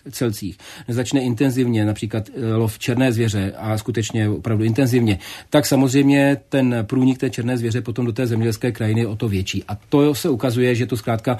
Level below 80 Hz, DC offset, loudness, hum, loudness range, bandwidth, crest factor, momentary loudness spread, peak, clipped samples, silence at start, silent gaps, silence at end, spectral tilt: -52 dBFS; under 0.1%; -20 LUFS; none; 3 LU; 14 kHz; 18 dB; 8 LU; -2 dBFS; under 0.1%; 0.05 s; none; 0 s; -6.5 dB/octave